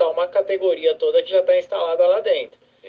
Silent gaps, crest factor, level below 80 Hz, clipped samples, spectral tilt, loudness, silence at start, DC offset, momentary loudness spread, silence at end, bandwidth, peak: none; 12 dB; -72 dBFS; under 0.1%; -4.5 dB/octave; -19 LUFS; 0 s; under 0.1%; 5 LU; 0 s; 5 kHz; -6 dBFS